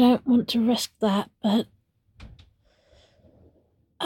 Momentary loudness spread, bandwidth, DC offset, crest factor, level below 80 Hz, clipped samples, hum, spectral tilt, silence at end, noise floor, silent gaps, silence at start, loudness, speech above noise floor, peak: 5 LU; 16.5 kHz; under 0.1%; 18 dB; -58 dBFS; under 0.1%; none; -5.5 dB/octave; 0 s; -65 dBFS; none; 0 s; -24 LUFS; 43 dB; -8 dBFS